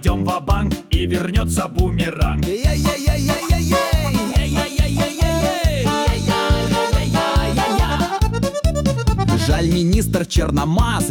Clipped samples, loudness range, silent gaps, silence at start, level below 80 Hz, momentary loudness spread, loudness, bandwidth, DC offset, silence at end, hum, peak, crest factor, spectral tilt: under 0.1%; 1 LU; none; 0 s; -22 dBFS; 3 LU; -18 LUFS; 18 kHz; under 0.1%; 0 s; none; -6 dBFS; 12 dB; -5.5 dB/octave